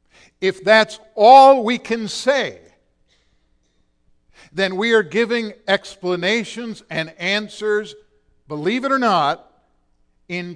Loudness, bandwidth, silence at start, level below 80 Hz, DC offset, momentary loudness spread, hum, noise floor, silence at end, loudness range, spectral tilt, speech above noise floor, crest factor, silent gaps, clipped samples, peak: -17 LUFS; 10.5 kHz; 0.4 s; -62 dBFS; under 0.1%; 17 LU; none; -63 dBFS; 0 s; 8 LU; -4 dB/octave; 46 dB; 18 dB; none; under 0.1%; 0 dBFS